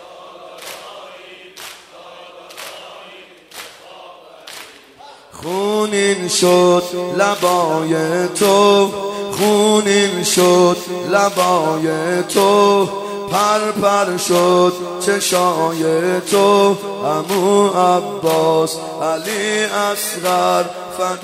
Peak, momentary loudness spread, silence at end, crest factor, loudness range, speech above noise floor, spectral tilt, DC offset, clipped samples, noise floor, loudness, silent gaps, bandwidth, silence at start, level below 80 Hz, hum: 0 dBFS; 21 LU; 0 s; 16 dB; 20 LU; 26 dB; -4 dB/octave; under 0.1%; under 0.1%; -41 dBFS; -15 LUFS; none; 16 kHz; 0 s; -62 dBFS; none